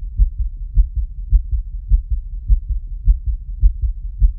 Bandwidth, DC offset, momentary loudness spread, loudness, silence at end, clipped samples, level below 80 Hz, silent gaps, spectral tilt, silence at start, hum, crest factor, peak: 0.3 kHz; under 0.1%; 7 LU; -22 LUFS; 0 s; under 0.1%; -16 dBFS; none; -13 dB/octave; 0 s; none; 16 dB; -2 dBFS